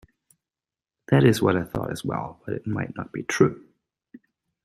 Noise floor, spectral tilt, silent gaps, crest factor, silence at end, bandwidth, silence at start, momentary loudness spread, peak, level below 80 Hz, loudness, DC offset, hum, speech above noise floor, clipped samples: under -90 dBFS; -6.5 dB/octave; none; 22 dB; 1.05 s; 15 kHz; 1.1 s; 14 LU; -4 dBFS; -54 dBFS; -24 LUFS; under 0.1%; none; over 67 dB; under 0.1%